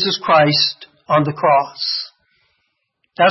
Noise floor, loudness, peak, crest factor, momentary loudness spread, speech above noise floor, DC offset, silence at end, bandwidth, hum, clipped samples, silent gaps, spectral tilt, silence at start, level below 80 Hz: -69 dBFS; -16 LUFS; -2 dBFS; 16 dB; 18 LU; 54 dB; under 0.1%; 0 s; 6 kHz; none; under 0.1%; none; -5.5 dB/octave; 0 s; -62 dBFS